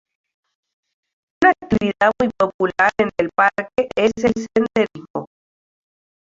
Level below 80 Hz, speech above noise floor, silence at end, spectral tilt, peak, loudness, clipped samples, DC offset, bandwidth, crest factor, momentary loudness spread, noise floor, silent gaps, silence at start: -50 dBFS; over 71 dB; 1.05 s; -5.5 dB/octave; -2 dBFS; -18 LUFS; under 0.1%; under 0.1%; 7.8 kHz; 18 dB; 6 LU; under -90 dBFS; 2.54-2.59 s, 5.10-5.14 s; 1.4 s